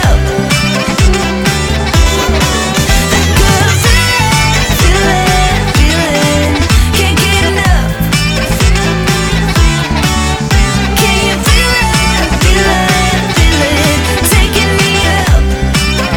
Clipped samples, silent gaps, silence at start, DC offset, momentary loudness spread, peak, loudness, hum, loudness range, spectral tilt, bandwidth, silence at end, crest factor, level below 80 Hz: under 0.1%; none; 0 s; under 0.1%; 3 LU; 0 dBFS; -10 LUFS; none; 2 LU; -4 dB/octave; over 20 kHz; 0 s; 10 dB; -14 dBFS